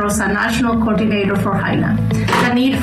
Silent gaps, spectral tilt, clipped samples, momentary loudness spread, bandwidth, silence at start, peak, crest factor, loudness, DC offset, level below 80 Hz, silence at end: none; -5.5 dB/octave; under 0.1%; 2 LU; 13.5 kHz; 0 s; -8 dBFS; 8 dB; -16 LUFS; under 0.1%; -36 dBFS; 0 s